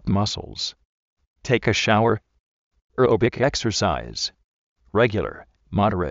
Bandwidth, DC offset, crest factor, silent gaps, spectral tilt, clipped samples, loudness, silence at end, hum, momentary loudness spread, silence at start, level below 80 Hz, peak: 8 kHz; under 0.1%; 20 dB; 0.85-1.17 s, 1.27-1.36 s, 2.40-2.71 s, 2.81-2.89 s, 4.44-4.76 s; -4.5 dB/octave; under 0.1%; -22 LUFS; 0 s; none; 10 LU; 0.05 s; -44 dBFS; -4 dBFS